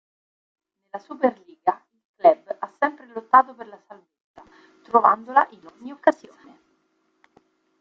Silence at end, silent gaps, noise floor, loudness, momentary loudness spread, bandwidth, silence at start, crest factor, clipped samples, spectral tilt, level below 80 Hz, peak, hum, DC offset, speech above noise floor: 1.65 s; 2.05-2.14 s, 4.21-4.34 s; -69 dBFS; -21 LUFS; 22 LU; 7.4 kHz; 0.95 s; 24 dB; under 0.1%; -6 dB/octave; -76 dBFS; -2 dBFS; none; under 0.1%; 48 dB